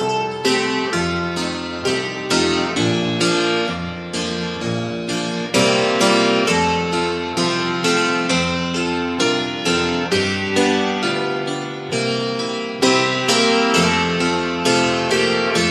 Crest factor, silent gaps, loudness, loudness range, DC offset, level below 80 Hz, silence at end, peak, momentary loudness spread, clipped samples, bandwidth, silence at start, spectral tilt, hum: 16 dB; none; -18 LUFS; 3 LU; under 0.1%; -50 dBFS; 0 s; -2 dBFS; 8 LU; under 0.1%; 13.5 kHz; 0 s; -4 dB/octave; none